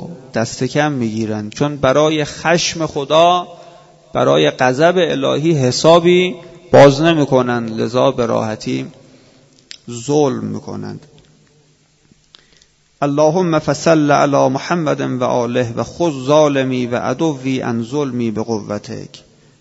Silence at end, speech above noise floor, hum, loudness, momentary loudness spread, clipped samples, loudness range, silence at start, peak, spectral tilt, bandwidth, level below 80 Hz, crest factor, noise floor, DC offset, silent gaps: 0.4 s; 40 dB; none; -15 LUFS; 13 LU; under 0.1%; 10 LU; 0 s; 0 dBFS; -5.5 dB/octave; 8 kHz; -50 dBFS; 16 dB; -54 dBFS; under 0.1%; none